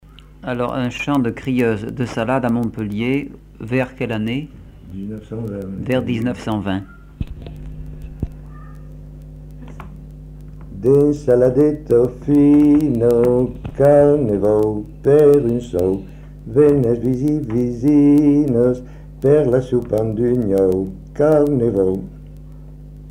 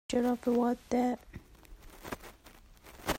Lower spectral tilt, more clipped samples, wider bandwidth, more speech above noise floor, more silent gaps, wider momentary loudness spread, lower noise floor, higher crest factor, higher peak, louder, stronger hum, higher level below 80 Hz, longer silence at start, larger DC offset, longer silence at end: first, -8.5 dB/octave vs -5 dB/octave; neither; about the same, 15 kHz vs 16 kHz; second, 20 dB vs 26 dB; neither; about the same, 23 LU vs 23 LU; second, -36 dBFS vs -57 dBFS; about the same, 14 dB vs 16 dB; first, -2 dBFS vs -18 dBFS; first, -17 LUFS vs -32 LUFS; neither; first, -38 dBFS vs -54 dBFS; first, 0.45 s vs 0.1 s; neither; about the same, 0 s vs 0 s